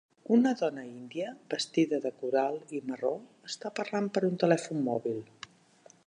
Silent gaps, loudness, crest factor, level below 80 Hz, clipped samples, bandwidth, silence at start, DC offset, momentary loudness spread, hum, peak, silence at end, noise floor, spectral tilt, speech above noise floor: none; -31 LUFS; 22 dB; -82 dBFS; under 0.1%; 10.5 kHz; 0.3 s; under 0.1%; 14 LU; none; -10 dBFS; 0.8 s; -60 dBFS; -5.5 dB/octave; 30 dB